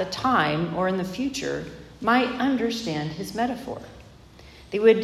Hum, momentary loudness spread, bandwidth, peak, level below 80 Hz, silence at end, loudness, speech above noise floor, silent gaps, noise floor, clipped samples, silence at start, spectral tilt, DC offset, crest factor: none; 12 LU; 14 kHz; -6 dBFS; -54 dBFS; 0 s; -25 LUFS; 24 dB; none; -48 dBFS; under 0.1%; 0 s; -5.5 dB/octave; under 0.1%; 20 dB